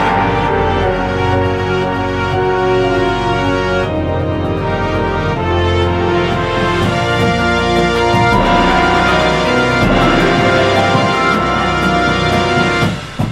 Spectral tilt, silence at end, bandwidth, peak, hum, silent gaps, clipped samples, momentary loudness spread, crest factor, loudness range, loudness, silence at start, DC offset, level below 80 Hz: -6 dB/octave; 0 s; 13.5 kHz; 0 dBFS; none; none; under 0.1%; 5 LU; 12 dB; 4 LU; -13 LUFS; 0 s; under 0.1%; -28 dBFS